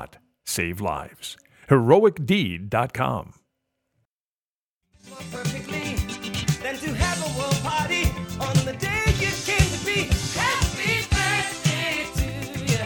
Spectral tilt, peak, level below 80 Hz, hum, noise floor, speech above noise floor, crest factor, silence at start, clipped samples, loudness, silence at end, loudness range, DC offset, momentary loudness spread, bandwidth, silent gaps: -4.5 dB/octave; -4 dBFS; -36 dBFS; none; under -90 dBFS; over 67 dB; 20 dB; 0 s; under 0.1%; -23 LUFS; 0 s; 8 LU; under 0.1%; 9 LU; 19.5 kHz; 4.05-4.81 s